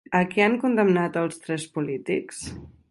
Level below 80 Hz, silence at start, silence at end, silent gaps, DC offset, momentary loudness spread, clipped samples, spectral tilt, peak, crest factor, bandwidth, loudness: -56 dBFS; 0.1 s; 0.25 s; none; under 0.1%; 15 LU; under 0.1%; -6 dB/octave; -4 dBFS; 20 dB; 11.5 kHz; -24 LUFS